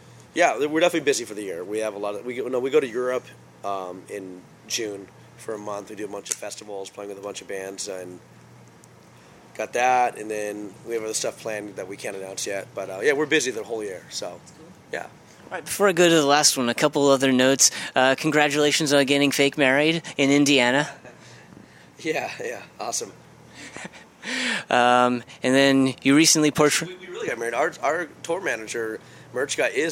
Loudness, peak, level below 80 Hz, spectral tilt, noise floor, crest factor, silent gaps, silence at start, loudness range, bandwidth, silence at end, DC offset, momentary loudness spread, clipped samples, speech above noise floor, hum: -22 LUFS; 0 dBFS; -68 dBFS; -3 dB/octave; -50 dBFS; 22 dB; none; 0.35 s; 14 LU; 17 kHz; 0 s; under 0.1%; 18 LU; under 0.1%; 27 dB; none